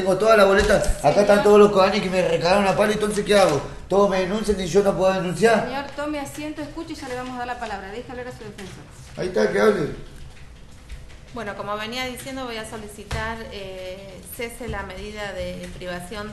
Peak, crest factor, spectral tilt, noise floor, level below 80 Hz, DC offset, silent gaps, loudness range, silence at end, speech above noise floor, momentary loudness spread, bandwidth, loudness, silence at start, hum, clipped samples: -2 dBFS; 20 dB; -5 dB/octave; -42 dBFS; -40 dBFS; under 0.1%; none; 14 LU; 0 s; 20 dB; 19 LU; 12.5 kHz; -21 LUFS; 0 s; none; under 0.1%